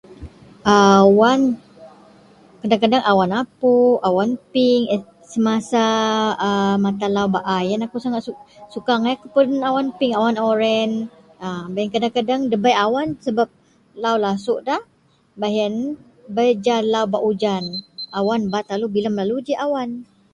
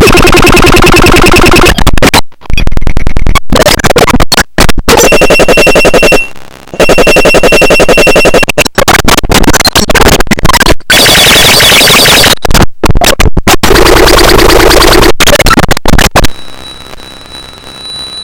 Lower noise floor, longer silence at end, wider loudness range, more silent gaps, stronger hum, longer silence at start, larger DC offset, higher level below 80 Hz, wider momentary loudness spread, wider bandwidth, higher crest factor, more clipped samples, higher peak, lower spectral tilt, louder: first, -48 dBFS vs -25 dBFS; first, 0.3 s vs 0 s; about the same, 4 LU vs 4 LU; neither; neither; about the same, 0.1 s vs 0 s; neither; second, -56 dBFS vs -12 dBFS; about the same, 12 LU vs 13 LU; second, 11 kHz vs over 20 kHz; first, 18 dB vs 4 dB; second, under 0.1% vs 20%; about the same, 0 dBFS vs 0 dBFS; first, -5.5 dB/octave vs -3 dB/octave; second, -19 LUFS vs -3 LUFS